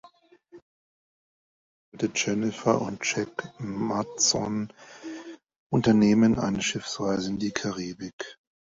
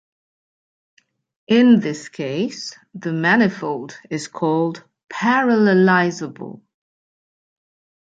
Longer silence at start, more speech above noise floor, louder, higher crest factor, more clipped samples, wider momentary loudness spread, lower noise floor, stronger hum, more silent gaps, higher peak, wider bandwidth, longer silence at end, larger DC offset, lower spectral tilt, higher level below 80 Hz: second, 0.55 s vs 1.5 s; second, 30 dB vs over 72 dB; second, -26 LUFS vs -18 LUFS; about the same, 20 dB vs 18 dB; neither; about the same, 19 LU vs 18 LU; second, -56 dBFS vs under -90 dBFS; neither; first, 0.62-1.92 s, 5.56-5.70 s, 8.13-8.19 s vs 5.04-5.08 s; second, -8 dBFS vs -2 dBFS; second, 7.8 kHz vs 8.6 kHz; second, 0.3 s vs 1.5 s; neither; second, -4 dB/octave vs -6 dB/octave; first, -58 dBFS vs -68 dBFS